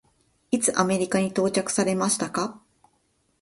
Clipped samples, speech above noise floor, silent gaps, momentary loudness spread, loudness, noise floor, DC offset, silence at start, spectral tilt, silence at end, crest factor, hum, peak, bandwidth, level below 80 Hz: under 0.1%; 45 dB; none; 7 LU; -24 LUFS; -69 dBFS; under 0.1%; 0.5 s; -4 dB/octave; 0.85 s; 20 dB; none; -6 dBFS; 12 kHz; -64 dBFS